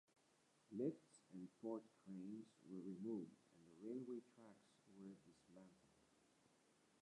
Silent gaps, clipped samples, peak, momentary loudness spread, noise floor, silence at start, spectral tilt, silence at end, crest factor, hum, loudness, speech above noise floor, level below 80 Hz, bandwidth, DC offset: none; under 0.1%; -34 dBFS; 19 LU; -79 dBFS; 0.7 s; -8 dB/octave; 1 s; 22 dB; none; -54 LUFS; 26 dB; under -90 dBFS; 11 kHz; under 0.1%